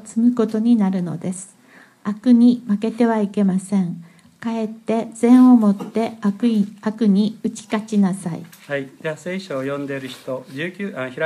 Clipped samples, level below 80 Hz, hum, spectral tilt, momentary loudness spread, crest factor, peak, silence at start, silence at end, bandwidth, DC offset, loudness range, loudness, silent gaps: under 0.1%; -72 dBFS; none; -7 dB/octave; 15 LU; 16 dB; -2 dBFS; 0.05 s; 0 s; 11.5 kHz; under 0.1%; 7 LU; -19 LUFS; none